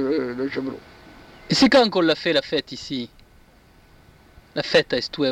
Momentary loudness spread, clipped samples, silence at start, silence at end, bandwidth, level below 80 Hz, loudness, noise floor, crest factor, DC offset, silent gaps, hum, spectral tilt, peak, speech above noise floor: 16 LU; under 0.1%; 0 s; 0 s; 12.5 kHz; -54 dBFS; -21 LUFS; -53 dBFS; 18 dB; under 0.1%; none; none; -4.5 dB/octave; -4 dBFS; 32 dB